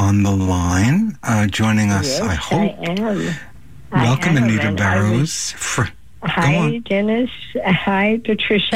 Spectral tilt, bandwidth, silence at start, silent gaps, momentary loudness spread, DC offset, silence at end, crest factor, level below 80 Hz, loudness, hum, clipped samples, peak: -5.5 dB/octave; 16 kHz; 0 s; none; 7 LU; 1%; 0 s; 12 dB; -42 dBFS; -18 LUFS; none; under 0.1%; -4 dBFS